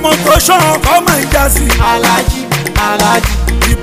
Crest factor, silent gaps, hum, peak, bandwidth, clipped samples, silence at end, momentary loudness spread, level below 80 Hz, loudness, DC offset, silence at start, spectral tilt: 10 dB; none; none; 0 dBFS; 16 kHz; 0.4%; 0 s; 6 LU; -16 dBFS; -10 LUFS; under 0.1%; 0 s; -3.5 dB/octave